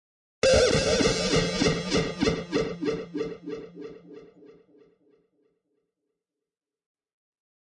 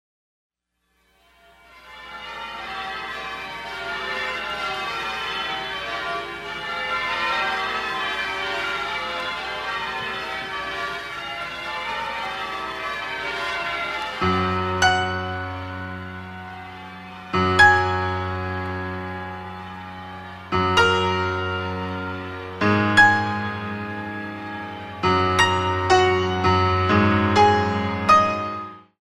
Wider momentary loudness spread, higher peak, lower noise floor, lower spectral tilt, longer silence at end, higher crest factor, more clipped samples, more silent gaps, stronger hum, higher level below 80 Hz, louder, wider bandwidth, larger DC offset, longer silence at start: about the same, 18 LU vs 16 LU; second, -10 dBFS vs -2 dBFS; first, -89 dBFS vs -71 dBFS; about the same, -4 dB/octave vs -4.5 dB/octave; first, 3.5 s vs 0.25 s; about the same, 20 dB vs 20 dB; neither; neither; neither; about the same, -46 dBFS vs -50 dBFS; second, -25 LUFS vs -22 LUFS; second, 11.5 kHz vs 14 kHz; neither; second, 0.45 s vs 1.75 s